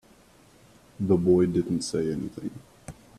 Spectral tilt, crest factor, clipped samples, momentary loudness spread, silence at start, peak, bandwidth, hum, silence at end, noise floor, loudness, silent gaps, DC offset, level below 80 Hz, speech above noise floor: -7 dB/octave; 18 dB; under 0.1%; 24 LU; 1 s; -8 dBFS; 12.5 kHz; none; 0.25 s; -56 dBFS; -25 LUFS; none; under 0.1%; -56 dBFS; 31 dB